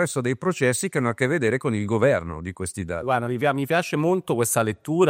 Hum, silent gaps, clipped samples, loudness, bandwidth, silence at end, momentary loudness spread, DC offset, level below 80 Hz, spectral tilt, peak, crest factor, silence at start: none; none; under 0.1%; -23 LUFS; 16 kHz; 0 s; 8 LU; under 0.1%; -56 dBFS; -5 dB/octave; -4 dBFS; 20 dB; 0 s